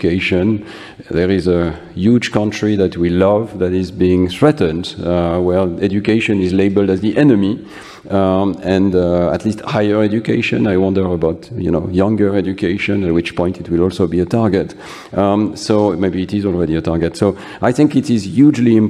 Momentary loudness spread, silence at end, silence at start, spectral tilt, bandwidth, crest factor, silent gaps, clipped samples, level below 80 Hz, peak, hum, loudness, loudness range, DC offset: 6 LU; 0 s; 0 s; -7.5 dB/octave; 11.5 kHz; 14 dB; none; under 0.1%; -40 dBFS; 0 dBFS; none; -15 LUFS; 2 LU; under 0.1%